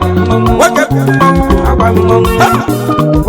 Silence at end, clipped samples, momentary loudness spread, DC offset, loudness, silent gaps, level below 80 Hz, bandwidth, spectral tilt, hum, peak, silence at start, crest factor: 0 s; 0.7%; 3 LU; under 0.1%; -9 LUFS; none; -20 dBFS; over 20 kHz; -6.5 dB/octave; none; 0 dBFS; 0 s; 8 dB